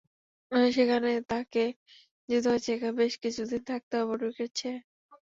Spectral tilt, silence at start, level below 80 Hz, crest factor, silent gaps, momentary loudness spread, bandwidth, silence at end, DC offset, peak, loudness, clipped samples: -4 dB/octave; 0.5 s; -68 dBFS; 18 dB; 1.76-1.86 s, 2.11-2.28 s, 3.83-3.91 s, 4.84-5.09 s; 9 LU; 7.8 kHz; 0.25 s; under 0.1%; -12 dBFS; -29 LUFS; under 0.1%